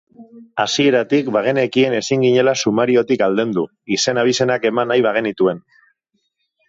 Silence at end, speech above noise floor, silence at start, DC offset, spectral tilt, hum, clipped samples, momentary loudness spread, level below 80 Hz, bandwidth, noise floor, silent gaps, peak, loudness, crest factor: 1.1 s; 53 dB; 0.2 s; under 0.1%; -4.5 dB/octave; none; under 0.1%; 6 LU; -62 dBFS; 7.8 kHz; -69 dBFS; none; -2 dBFS; -17 LUFS; 14 dB